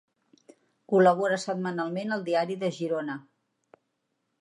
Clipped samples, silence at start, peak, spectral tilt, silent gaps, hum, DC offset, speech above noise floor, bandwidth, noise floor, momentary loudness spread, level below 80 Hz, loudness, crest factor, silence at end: under 0.1%; 0.9 s; -8 dBFS; -6 dB/octave; none; none; under 0.1%; 52 dB; 11 kHz; -78 dBFS; 10 LU; -82 dBFS; -27 LUFS; 20 dB; 1.2 s